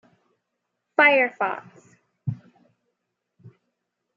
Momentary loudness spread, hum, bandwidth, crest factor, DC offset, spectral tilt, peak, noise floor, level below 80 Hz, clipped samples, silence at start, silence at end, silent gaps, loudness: 19 LU; 60 Hz at -55 dBFS; 7.4 kHz; 24 dB; under 0.1%; -6.5 dB/octave; -4 dBFS; -80 dBFS; -78 dBFS; under 0.1%; 1 s; 0.65 s; none; -21 LUFS